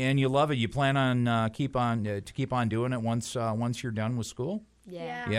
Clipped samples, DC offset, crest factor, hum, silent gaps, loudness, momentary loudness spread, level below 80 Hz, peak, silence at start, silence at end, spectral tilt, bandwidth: under 0.1%; under 0.1%; 16 dB; none; none; -29 LUFS; 10 LU; -56 dBFS; -12 dBFS; 0 s; 0 s; -6 dB/octave; 14 kHz